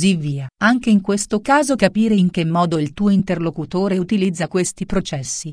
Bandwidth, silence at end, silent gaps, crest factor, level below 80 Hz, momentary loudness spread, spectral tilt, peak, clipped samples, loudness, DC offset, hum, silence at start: 10.5 kHz; 0 s; none; 16 dB; -42 dBFS; 7 LU; -5.5 dB/octave; -2 dBFS; under 0.1%; -18 LUFS; under 0.1%; none; 0 s